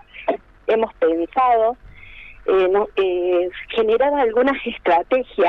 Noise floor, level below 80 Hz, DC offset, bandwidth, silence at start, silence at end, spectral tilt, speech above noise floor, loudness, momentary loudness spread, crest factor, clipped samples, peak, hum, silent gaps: -40 dBFS; -48 dBFS; under 0.1%; 5.4 kHz; 0.15 s; 0 s; -6.5 dB/octave; 22 dB; -19 LUFS; 9 LU; 14 dB; under 0.1%; -6 dBFS; none; none